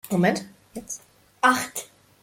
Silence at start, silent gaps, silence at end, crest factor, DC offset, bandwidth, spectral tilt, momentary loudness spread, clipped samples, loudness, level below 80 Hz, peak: 0.05 s; none; 0.4 s; 22 dB; under 0.1%; 16.5 kHz; -4.5 dB/octave; 20 LU; under 0.1%; -24 LUFS; -64 dBFS; -4 dBFS